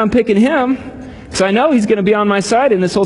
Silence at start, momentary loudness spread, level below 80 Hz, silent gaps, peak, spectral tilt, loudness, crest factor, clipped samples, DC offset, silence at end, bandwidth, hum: 0 s; 11 LU; -42 dBFS; none; 0 dBFS; -5.5 dB/octave; -13 LUFS; 12 dB; under 0.1%; under 0.1%; 0 s; 11 kHz; none